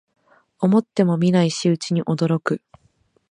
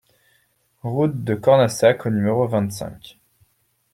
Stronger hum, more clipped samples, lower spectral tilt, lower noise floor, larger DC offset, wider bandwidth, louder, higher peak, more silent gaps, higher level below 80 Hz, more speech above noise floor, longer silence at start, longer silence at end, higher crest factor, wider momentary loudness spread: neither; neither; about the same, -6.5 dB/octave vs -6.5 dB/octave; about the same, -62 dBFS vs -65 dBFS; neither; second, 10 kHz vs 16 kHz; about the same, -20 LUFS vs -19 LUFS; about the same, -4 dBFS vs -2 dBFS; neither; second, -64 dBFS vs -58 dBFS; about the same, 43 dB vs 46 dB; second, 0.6 s vs 0.85 s; about the same, 0.75 s vs 0.85 s; about the same, 18 dB vs 18 dB; second, 6 LU vs 15 LU